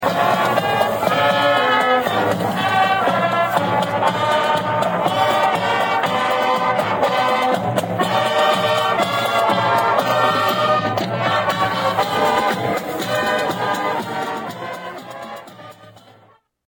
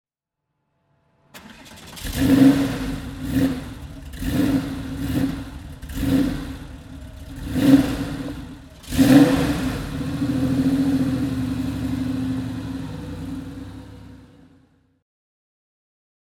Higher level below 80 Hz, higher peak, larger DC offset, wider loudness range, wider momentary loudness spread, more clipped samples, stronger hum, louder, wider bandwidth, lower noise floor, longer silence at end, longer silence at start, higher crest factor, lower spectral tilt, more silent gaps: second, -58 dBFS vs -38 dBFS; about the same, -2 dBFS vs -2 dBFS; neither; second, 5 LU vs 11 LU; second, 7 LU vs 23 LU; neither; neither; first, -18 LUFS vs -21 LUFS; about the same, 17.5 kHz vs 18 kHz; second, -53 dBFS vs -81 dBFS; second, 0.8 s vs 2.15 s; second, 0 s vs 1.35 s; second, 16 dB vs 22 dB; second, -4.5 dB/octave vs -6.5 dB/octave; neither